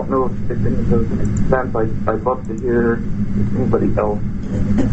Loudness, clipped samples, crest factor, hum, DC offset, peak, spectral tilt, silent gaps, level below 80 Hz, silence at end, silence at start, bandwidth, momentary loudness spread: -19 LUFS; under 0.1%; 14 dB; none; under 0.1%; -2 dBFS; -9 dB/octave; none; -26 dBFS; 0 s; 0 s; 8 kHz; 5 LU